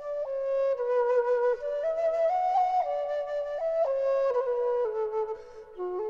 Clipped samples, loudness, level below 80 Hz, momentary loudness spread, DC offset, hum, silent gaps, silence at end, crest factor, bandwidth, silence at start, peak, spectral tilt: under 0.1%; -28 LUFS; -64 dBFS; 8 LU; under 0.1%; none; none; 0 s; 10 dB; 7.2 kHz; 0 s; -18 dBFS; -4.5 dB/octave